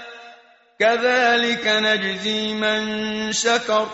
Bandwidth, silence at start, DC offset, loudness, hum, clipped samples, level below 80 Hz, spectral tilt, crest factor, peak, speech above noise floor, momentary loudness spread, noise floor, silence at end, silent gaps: 8 kHz; 0 s; under 0.1%; -19 LUFS; none; under 0.1%; -60 dBFS; -0.5 dB/octave; 16 dB; -6 dBFS; 30 dB; 6 LU; -50 dBFS; 0 s; none